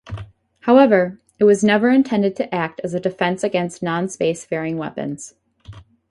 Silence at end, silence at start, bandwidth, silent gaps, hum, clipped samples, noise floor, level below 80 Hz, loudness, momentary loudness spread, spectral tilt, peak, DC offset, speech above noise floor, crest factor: 0.3 s; 0.05 s; 11.5 kHz; none; none; under 0.1%; -42 dBFS; -52 dBFS; -18 LUFS; 14 LU; -6 dB/octave; -2 dBFS; under 0.1%; 24 dB; 18 dB